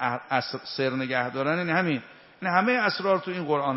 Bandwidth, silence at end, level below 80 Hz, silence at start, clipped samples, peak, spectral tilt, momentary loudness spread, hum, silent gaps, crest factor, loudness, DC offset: 6 kHz; 0 s; -72 dBFS; 0 s; under 0.1%; -6 dBFS; -3.5 dB/octave; 6 LU; none; none; 20 dB; -26 LUFS; under 0.1%